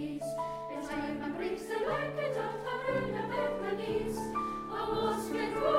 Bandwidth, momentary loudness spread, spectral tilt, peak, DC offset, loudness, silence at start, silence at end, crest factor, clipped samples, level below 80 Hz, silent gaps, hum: 16 kHz; 4 LU; -5.5 dB/octave; -14 dBFS; under 0.1%; -35 LUFS; 0 s; 0 s; 18 dB; under 0.1%; -56 dBFS; none; none